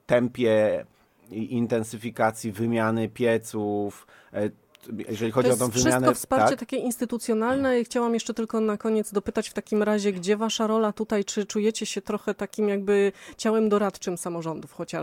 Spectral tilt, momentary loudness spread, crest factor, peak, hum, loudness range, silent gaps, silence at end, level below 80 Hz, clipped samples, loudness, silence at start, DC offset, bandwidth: -5 dB/octave; 9 LU; 20 dB; -6 dBFS; none; 3 LU; none; 0 s; -58 dBFS; under 0.1%; -25 LUFS; 0.1 s; under 0.1%; 17 kHz